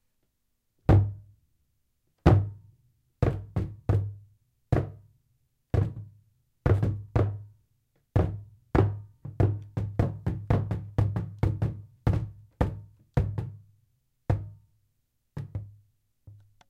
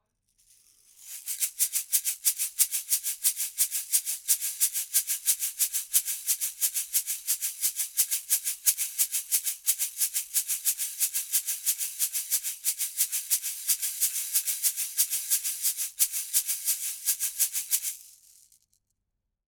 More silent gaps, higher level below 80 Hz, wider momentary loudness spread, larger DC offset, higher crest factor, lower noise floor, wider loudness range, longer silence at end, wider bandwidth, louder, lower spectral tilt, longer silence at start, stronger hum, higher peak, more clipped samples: neither; first, -40 dBFS vs -72 dBFS; first, 19 LU vs 3 LU; neither; about the same, 24 dB vs 24 dB; second, -76 dBFS vs -82 dBFS; first, 6 LU vs 2 LU; second, 0.35 s vs 1.4 s; second, 6 kHz vs over 20 kHz; second, -29 LUFS vs -26 LUFS; first, -9.5 dB/octave vs 6 dB/octave; about the same, 0.9 s vs 1 s; neither; about the same, -6 dBFS vs -6 dBFS; neither